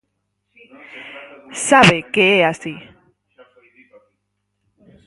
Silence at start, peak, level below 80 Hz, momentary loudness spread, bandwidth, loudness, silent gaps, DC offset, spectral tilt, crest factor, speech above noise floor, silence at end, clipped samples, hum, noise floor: 0.95 s; 0 dBFS; -54 dBFS; 26 LU; 11.5 kHz; -13 LUFS; none; under 0.1%; -4 dB/octave; 20 dB; 56 dB; 2.25 s; under 0.1%; 50 Hz at -45 dBFS; -73 dBFS